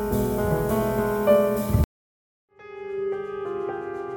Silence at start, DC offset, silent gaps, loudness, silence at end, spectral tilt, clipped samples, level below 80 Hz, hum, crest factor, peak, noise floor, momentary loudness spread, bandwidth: 0 s; under 0.1%; 1.84-2.48 s; -25 LUFS; 0 s; -7 dB/octave; under 0.1%; -36 dBFS; none; 18 dB; -6 dBFS; under -90 dBFS; 12 LU; 17.5 kHz